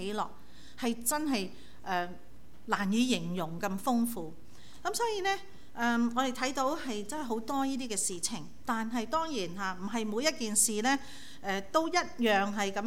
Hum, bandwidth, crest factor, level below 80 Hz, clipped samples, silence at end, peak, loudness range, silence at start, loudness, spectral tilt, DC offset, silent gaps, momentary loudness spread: none; 17 kHz; 20 dB; -62 dBFS; under 0.1%; 0 s; -12 dBFS; 3 LU; 0 s; -32 LUFS; -3 dB/octave; 0.9%; none; 10 LU